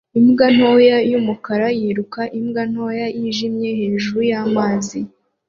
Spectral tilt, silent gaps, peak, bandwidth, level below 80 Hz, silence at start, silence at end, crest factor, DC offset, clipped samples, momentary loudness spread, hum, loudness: -5.5 dB/octave; none; -2 dBFS; 7.6 kHz; -58 dBFS; 0.15 s; 0.4 s; 14 dB; under 0.1%; under 0.1%; 11 LU; none; -17 LUFS